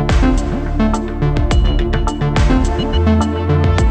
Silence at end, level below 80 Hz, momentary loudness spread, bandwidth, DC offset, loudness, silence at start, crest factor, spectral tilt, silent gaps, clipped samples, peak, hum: 0 s; -16 dBFS; 4 LU; 9.2 kHz; under 0.1%; -16 LUFS; 0 s; 12 dB; -7 dB/octave; none; under 0.1%; 0 dBFS; none